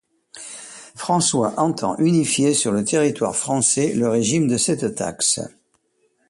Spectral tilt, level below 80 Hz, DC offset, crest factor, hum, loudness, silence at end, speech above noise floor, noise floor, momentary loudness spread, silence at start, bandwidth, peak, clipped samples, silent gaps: -4 dB/octave; -58 dBFS; under 0.1%; 16 dB; none; -19 LUFS; 0.8 s; 46 dB; -65 dBFS; 17 LU; 0.35 s; 11.5 kHz; -4 dBFS; under 0.1%; none